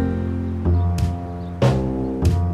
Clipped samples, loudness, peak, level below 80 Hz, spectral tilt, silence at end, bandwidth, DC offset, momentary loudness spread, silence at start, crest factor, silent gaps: under 0.1%; -22 LUFS; -4 dBFS; -30 dBFS; -8 dB/octave; 0 s; 11.5 kHz; 0.4%; 5 LU; 0 s; 16 dB; none